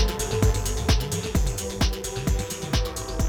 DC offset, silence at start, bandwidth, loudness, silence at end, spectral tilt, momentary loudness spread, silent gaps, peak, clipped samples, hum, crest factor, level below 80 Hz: 0.1%; 0 s; over 20 kHz; -26 LUFS; 0 s; -4.5 dB/octave; 5 LU; none; -8 dBFS; under 0.1%; none; 16 dB; -28 dBFS